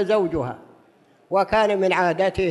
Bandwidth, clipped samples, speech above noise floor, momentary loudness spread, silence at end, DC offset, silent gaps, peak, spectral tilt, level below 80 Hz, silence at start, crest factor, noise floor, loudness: 11.5 kHz; under 0.1%; 36 dB; 10 LU; 0 s; under 0.1%; none; -6 dBFS; -6 dB/octave; -48 dBFS; 0 s; 14 dB; -56 dBFS; -21 LUFS